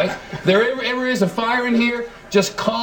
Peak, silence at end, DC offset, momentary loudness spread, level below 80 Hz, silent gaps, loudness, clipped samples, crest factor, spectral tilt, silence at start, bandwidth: -2 dBFS; 0 s; under 0.1%; 5 LU; -52 dBFS; none; -19 LUFS; under 0.1%; 18 dB; -4.5 dB/octave; 0 s; 18 kHz